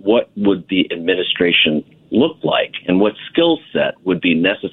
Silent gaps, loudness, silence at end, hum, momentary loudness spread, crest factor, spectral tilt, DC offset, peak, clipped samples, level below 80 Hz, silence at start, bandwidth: none; -16 LUFS; 0.05 s; none; 5 LU; 16 dB; -8.5 dB/octave; under 0.1%; 0 dBFS; under 0.1%; -54 dBFS; 0.05 s; 4.2 kHz